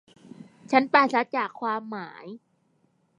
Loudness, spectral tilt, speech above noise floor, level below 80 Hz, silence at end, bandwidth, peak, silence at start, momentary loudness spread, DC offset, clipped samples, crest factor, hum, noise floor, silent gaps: -24 LUFS; -5 dB/octave; 43 dB; -82 dBFS; 0.8 s; 10.5 kHz; -4 dBFS; 0.4 s; 21 LU; under 0.1%; under 0.1%; 24 dB; none; -68 dBFS; none